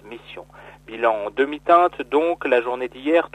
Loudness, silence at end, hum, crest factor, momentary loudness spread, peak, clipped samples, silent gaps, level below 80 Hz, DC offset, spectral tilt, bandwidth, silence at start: -20 LUFS; 0.05 s; none; 18 dB; 21 LU; -4 dBFS; under 0.1%; none; -56 dBFS; under 0.1%; -5.5 dB/octave; 9.2 kHz; 0.05 s